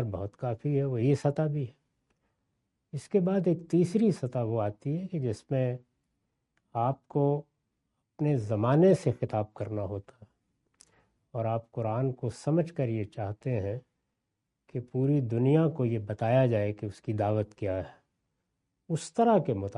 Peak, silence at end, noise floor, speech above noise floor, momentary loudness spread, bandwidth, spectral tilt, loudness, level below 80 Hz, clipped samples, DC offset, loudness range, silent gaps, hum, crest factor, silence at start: -12 dBFS; 0 s; -83 dBFS; 55 dB; 12 LU; 11.5 kHz; -8.5 dB/octave; -29 LUFS; -68 dBFS; under 0.1%; under 0.1%; 5 LU; none; none; 18 dB; 0 s